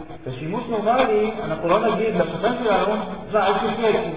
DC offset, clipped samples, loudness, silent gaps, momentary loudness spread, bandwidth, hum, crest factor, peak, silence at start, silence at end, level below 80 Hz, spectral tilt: 0.7%; under 0.1%; -21 LUFS; none; 8 LU; 4 kHz; none; 16 dB; -6 dBFS; 0 s; 0 s; -48 dBFS; -10 dB/octave